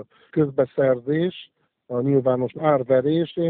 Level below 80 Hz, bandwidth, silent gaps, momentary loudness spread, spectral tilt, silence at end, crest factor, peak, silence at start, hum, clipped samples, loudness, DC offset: -62 dBFS; 4.3 kHz; none; 8 LU; -7 dB/octave; 0 s; 16 dB; -6 dBFS; 0 s; none; under 0.1%; -22 LUFS; under 0.1%